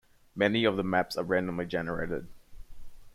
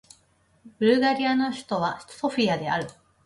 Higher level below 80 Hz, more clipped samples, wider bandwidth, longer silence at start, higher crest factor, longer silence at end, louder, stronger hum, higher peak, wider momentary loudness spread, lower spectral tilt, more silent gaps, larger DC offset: first, -52 dBFS vs -64 dBFS; neither; first, 15.5 kHz vs 11.5 kHz; second, 0.35 s vs 0.65 s; about the same, 20 dB vs 18 dB; second, 0.05 s vs 0.35 s; second, -30 LUFS vs -25 LUFS; neither; about the same, -10 dBFS vs -8 dBFS; about the same, 10 LU vs 9 LU; about the same, -6 dB/octave vs -5.5 dB/octave; neither; neither